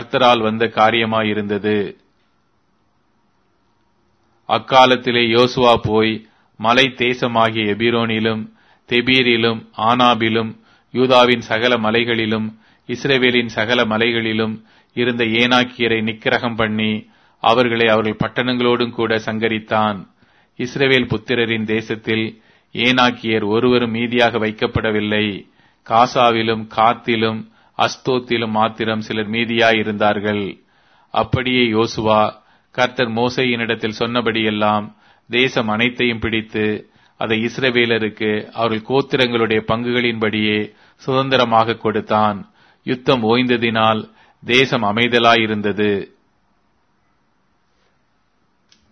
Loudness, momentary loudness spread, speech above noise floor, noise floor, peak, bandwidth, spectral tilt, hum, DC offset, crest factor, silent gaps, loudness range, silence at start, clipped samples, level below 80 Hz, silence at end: -17 LUFS; 8 LU; 47 dB; -64 dBFS; 0 dBFS; 6.6 kHz; -5.5 dB/octave; none; under 0.1%; 18 dB; none; 3 LU; 0 s; under 0.1%; -50 dBFS; 2.85 s